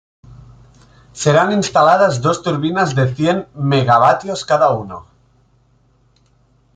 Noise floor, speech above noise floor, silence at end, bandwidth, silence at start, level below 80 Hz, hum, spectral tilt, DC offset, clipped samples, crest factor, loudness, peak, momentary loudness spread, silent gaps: -55 dBFS; 41 dB; 1.75 s; 9.4 kHz; 0.3 s; -50 dBFS; none; -5.5 dB/octave; under 0.1%; under 0.1%; 16 dB; -15 LUFS; -2 dBFS; 8 LU; none